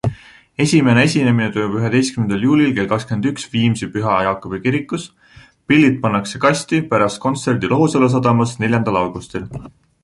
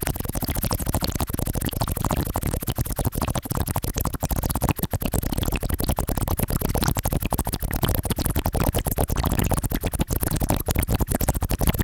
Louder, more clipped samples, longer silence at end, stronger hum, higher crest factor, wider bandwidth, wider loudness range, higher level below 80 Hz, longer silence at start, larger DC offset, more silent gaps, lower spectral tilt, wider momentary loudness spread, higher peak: first, -17 LUFS vs -25 LUFS; neither; first, 0.35 s vs 0 s; neither; second, 16 dB vs 22 dB; second, 11.5 kHz vs 19 kHz; about the same, 2 LU vs 2 LU; second, -46 dBFS vs -30 dBFS; about the same, 0.05 s vs 0 s; neither; neither; about the same, -6 dB/octave vs -5 dB/octave; first, 11 LU vs 3 LU; about the same, -2 dBFS vs -2 dBFS